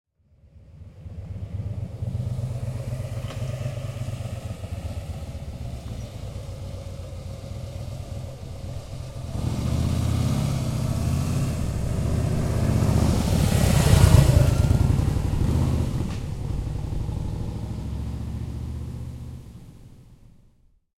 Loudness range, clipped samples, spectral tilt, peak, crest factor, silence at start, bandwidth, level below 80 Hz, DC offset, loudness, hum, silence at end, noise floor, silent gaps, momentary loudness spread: 15 LU; under 0.1%; -6.5 dB/octave; -2 dBFS; 22 dB; 0.55 s; 16.5 kHz; -32 dBFS; under 0.1%; -26 LUFS; none; 0.85 s; -59 dBFS; none; 16 LU